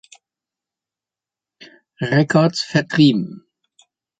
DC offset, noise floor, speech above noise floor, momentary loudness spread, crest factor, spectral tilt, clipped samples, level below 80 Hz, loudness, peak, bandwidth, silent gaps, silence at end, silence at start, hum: under 0.1%; -89 dBFS; 73 dB; 11 LU; 20 dB; -6 dB/octave; under 0.1%; -60 dBFS; -17 LUFS; -2 dBFS; 9.2 kHz; none; 0.85 s; 2 s; none